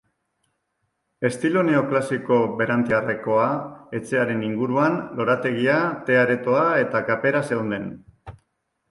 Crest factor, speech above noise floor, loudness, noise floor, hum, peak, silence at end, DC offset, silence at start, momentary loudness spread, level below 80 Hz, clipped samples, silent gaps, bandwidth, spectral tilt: 16 dB; 53 dB; -22 LUFS; -75 dBFS; none; -6 dBFS; 0.6 s; under 0.1%; 1.2 s; 8 LU; -60 dBFS; under 0.1%; none; 11.5 kHz; -7 dB/octave